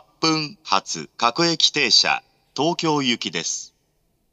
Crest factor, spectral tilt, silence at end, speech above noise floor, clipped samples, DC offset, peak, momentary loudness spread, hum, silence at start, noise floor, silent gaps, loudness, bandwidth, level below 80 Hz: 22 dB; -2.5 dB/octave; 0.65 s; 46 dB; under 0.1%; under 0.1%; -2 dBFS; 11 LU; none; 0.2 s; -67 dBFS; none; -20 LUFS; 10.5 kHz; -70 dBFS